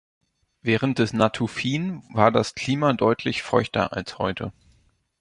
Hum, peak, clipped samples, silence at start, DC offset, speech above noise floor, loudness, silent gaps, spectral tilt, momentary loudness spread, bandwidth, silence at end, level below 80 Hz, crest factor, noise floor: none; -2 dBFS; under 0.1%; 0.65 s; under 0.1%; 40 dB; -23 LUFS; none; -6 dB/octave; 8 LU; 11.5 kHz; 0.7 s; -52 dBFS; 22 dB; -62 dBFS